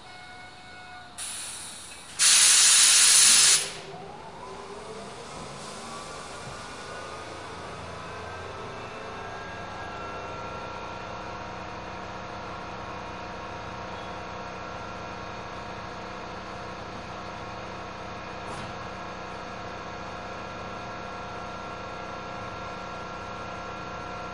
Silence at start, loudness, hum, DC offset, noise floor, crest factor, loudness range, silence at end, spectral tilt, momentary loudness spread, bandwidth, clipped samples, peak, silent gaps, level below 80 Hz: 0.95 s; -19 LUFS; none; 0.2%; -45 dBFS; 26 dB; 21 LU; 0 s; 0 dB/octave; 23 LU; 11.5 kHz; under 0.1%; -4 dBFS; none; -54 dBFS